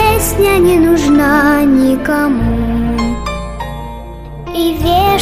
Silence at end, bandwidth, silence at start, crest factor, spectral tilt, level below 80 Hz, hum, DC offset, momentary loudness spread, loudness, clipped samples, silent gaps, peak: 0 s; 15.5 kHz; 0 s; 10 dB; -5.5 dB/octave; -24 dBFS; none; under 0.1%; 15 LU; -12 LUFS; under 0.1%; none; 0 dBFS